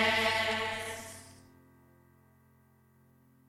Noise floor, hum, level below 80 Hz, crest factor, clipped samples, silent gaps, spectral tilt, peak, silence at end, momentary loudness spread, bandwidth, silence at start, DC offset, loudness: -65 dBFS; none; -66 dBFS; 20 dB; under 0.1%; none; -2.5 dB/octave; -16 dBFS; 2.15 s; 22 LU; 16.5 kHz; 0 s; under 0.1%; -31 LUFS